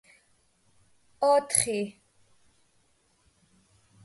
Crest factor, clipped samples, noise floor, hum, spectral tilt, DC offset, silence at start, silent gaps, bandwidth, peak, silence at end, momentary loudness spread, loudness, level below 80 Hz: 26 dB; under 0.1%; -68 dBFS; none; -2.5 dB/octave; under 0.1%; 1.2 s; none; 12 kHz; -6 dBFS; 2.15 s; 11 LU; -26 LUFS; -68 dBFS